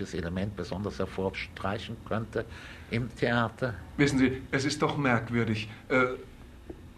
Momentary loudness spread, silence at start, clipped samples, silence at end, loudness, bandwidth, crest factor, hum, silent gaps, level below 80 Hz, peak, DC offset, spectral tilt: 12 LU; 0 s; under 0.1%; 0 s; -30 LUFS; 13.5 kHz; 20 dB; none; none; -50 dBFS; -10 dBFS; under 0.1%; -6 dB/octave